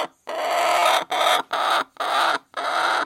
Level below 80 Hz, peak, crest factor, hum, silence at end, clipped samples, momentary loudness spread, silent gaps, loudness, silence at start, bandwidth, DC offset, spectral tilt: -78 dBFS; -6 dBFS; 16 dB; none; 0 s; under 0.1%; 7 LU; none; -21 LUFS; 0 s; 16.5 kHz; under 0.1%; 0 dB/octave